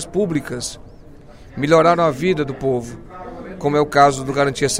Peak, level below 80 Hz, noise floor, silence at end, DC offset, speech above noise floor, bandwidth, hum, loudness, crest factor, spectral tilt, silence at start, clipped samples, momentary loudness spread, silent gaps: 0 dBFS; -44 dBFS; -40 dBFS; 0 s; under 0.1%; 23 dB; 16 kHz; none; -18 LUFS; 18 dB; -5 dB/octave; 0 s; under 0.1%; 21 LU; none